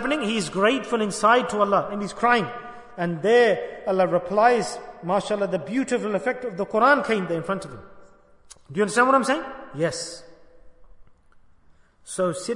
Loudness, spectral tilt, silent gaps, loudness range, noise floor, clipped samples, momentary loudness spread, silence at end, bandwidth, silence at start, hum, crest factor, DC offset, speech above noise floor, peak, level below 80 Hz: -22 LUFS; -4.5 dB/octave; none; 4 LU; -55 dBFS; under 0.1%; 14 LU; 0 s; 11 kHz; 0 s; none; 20 dB; under 0.1%; 32 dB; -4 dBFS; -58 dBFS